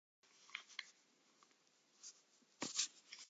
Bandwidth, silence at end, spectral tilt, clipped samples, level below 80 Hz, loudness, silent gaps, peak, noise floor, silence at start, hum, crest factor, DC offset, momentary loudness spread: 9 kHz; 0 s; 0.5 dB/octave; under 0.1%; under -90 dBFS; -46 LUFS; none; -24 dBFS; -76 dBFS; 0.35 s; none; 30 dB; under 0.1%; 19 LU